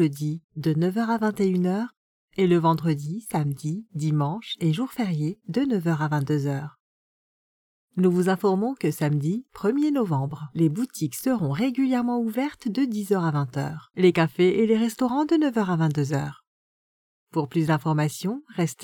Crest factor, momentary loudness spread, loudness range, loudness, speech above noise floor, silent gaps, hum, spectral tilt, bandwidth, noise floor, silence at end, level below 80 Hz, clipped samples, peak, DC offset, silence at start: 16 dB; 9 LU; 4 LU; -25 LUFS; over 66 dB; 0.44-0.49 s, 1.97-2.28 s, 6.80-7.88 s, 16.47-17.27 s; none; -7 dB/octave; 18 kHz; under -90 dBFS; 0 s; -66 dBFS; under 0.1%; -8 dBFS; under 0.1%; 0 s